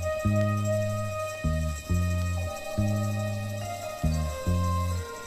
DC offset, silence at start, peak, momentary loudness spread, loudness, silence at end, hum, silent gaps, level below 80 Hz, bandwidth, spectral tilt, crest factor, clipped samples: under 0.1%; 0 s; -14 dBFS; 6 LU; -29 LUFS; 0 s; none; none; -38 dBFS; 15.5 kHz; -6.5 dB/octave; 14 dB; under 0.1%